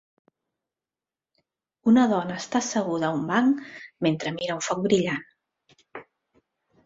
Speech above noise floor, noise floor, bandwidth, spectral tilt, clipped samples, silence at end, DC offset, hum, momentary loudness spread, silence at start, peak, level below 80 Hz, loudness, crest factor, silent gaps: over 66 dB; under -90 dBFS; 7.8 kHz; -5 dB/octave; under 0.1%; 0.85 s; under 0.1%; none; 22 LU; 1.85 s; -8 dBFS; -66 dBFS; -25 LUFS; 18 dB; none